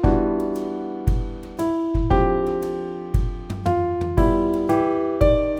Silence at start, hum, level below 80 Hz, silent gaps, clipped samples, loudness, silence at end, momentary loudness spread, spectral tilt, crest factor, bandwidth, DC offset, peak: 0 s; none; -28 dBFS; none; under 0.1%; -22 LUFS; 0 s; 8 LU; -8.5 dB/octave; 18 dB; 15.5 kHz; under 0.1%; -2 dBFS